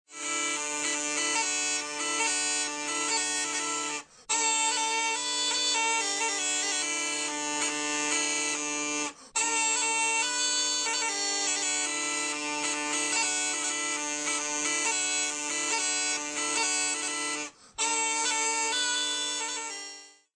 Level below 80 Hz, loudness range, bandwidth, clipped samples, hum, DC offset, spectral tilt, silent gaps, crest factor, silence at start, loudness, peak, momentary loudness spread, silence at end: -76 dBFS; 2 LU; 10 kHz; under 0.1%; none; under 0.1%; 1.5 dB/octave; none; 16 dB; 0.1 s; -27 LUFS; -12 dBFS; 5 LU; 0.25 s